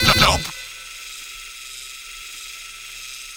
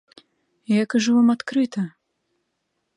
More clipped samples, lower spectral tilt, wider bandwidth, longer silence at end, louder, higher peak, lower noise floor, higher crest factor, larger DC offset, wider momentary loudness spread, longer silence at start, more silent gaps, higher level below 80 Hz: neither; second, -2.5 dB/octave vs -5.5 dB/octave; first, over 20 kHz vs 10.5 kHz; second, 0 s vs 1.1 s; second, -24 LUFS vs -21 LUFS; first, 0 dBFS vs -8 dBFS; second, -36 dBFS vs -75 dBFS; first, 24 dB vs 14 dB; neither; first, 18 LU vs 10 LU; second, 0 s vs 0.7 s; neither; first, -36 dBFS vs -74 dBFS